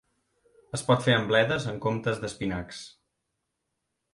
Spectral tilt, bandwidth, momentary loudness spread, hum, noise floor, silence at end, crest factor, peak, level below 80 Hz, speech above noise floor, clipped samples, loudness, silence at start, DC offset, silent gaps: -5 dB/octave; 11.5 kHz; 17 LU; none; -81 dBFS; 1.25 s; 22 dB; -8 dBFS; -56 dBFS; 55 dB; under 0.1%; -27 LUFS; 0.75 s; under 0.1%; none